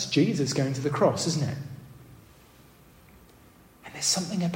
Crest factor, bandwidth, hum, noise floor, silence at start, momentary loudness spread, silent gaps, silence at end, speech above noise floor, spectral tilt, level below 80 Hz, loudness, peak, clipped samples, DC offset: 20 dB; 16 kHz; none; -55 dBFS; 0 s; 19 LU; none; 0 s; 29 dB; -4.5 dB/octave; -62 dBFS; -26 LUFS; -10 dBFS; under 0.1%; under 0.1%